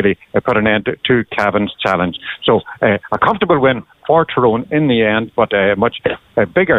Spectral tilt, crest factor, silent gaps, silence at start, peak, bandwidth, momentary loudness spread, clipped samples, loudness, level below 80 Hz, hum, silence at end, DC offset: -7.5 dB/octave; 14 dB; none; 0 s; 0 dBFS; 8 kHz; 5 LU; under 0.1%; -15 LUFS; -46 dBFS; none; 0 s; under 0.1%